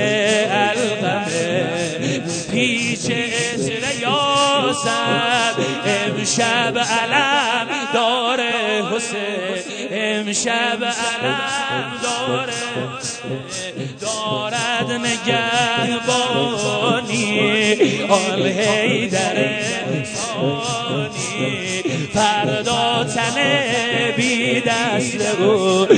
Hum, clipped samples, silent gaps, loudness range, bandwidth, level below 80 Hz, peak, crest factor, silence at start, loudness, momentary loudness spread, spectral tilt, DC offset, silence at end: none; under 0.1%; none; 4 LU; 9.4 kHz; -58 dBFS; 0 dBFS; 18 dB; 0 s; -18 LUFS; 7 LU; -3.5 dB/octave; under 0.1%; 0 s